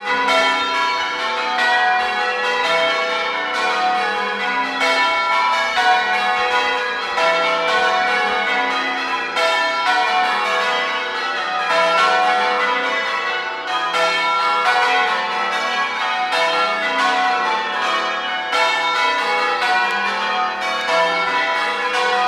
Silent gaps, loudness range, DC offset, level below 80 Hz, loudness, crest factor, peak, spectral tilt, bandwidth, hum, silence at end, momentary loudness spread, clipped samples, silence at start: none; 1 LU; under 0.1%; -62 dBFS; -17 LUFS; 14 dB; -4 dBFS; -1 dB/octave; 13.5 kHz; none; 0 s; 5 LU; under 0.1%; 0 s